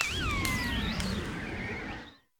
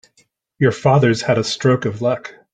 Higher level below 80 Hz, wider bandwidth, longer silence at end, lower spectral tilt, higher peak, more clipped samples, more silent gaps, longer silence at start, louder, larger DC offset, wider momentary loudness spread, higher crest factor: first, -42 dBFS vs -54 dBFS; first, 18 kHz vs 9.4 kHz; about the same, 0.25 s vs 0.25 s; second, -4 dB/octave vs -6 dB/octave; second, -6 dBFS vs -2 dBFS; neither; neither; second, 0 s vs 0.6 s; second, -33 LUFS vs -17 LUFS; neither; about the same, 9 LU vs 7 LU; first, 26 dB vs 16 dB